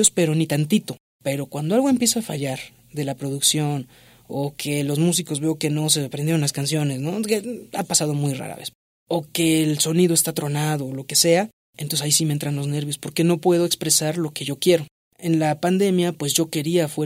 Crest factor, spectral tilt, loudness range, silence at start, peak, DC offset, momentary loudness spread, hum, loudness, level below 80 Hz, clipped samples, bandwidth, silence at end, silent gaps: 20 dB; -4 dB/octave; 3 LU; 0 s; -2 dBFS; under 0.1%; 11 LU; none; -21 LUFS; -62 dBFS; under 0.1%; 16 kHz; 0 s; 1.00-1.20 s, 8.75-9.06 s, 11.53-11.73 s, 14.91-15.11 s